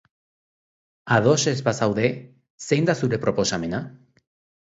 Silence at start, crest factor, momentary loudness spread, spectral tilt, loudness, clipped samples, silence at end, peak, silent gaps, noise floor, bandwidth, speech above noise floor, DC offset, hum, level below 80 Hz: 1.05 s; 20 dB; 13 LU; -5 dB/octave; -22 LUFS; under 0.1%; 0.7 s; -4 dBFS; 2.50-2.58 s; under -90 dBFS; 8 kHz; over 68 dB; under 0.1%; none; -56 dBFS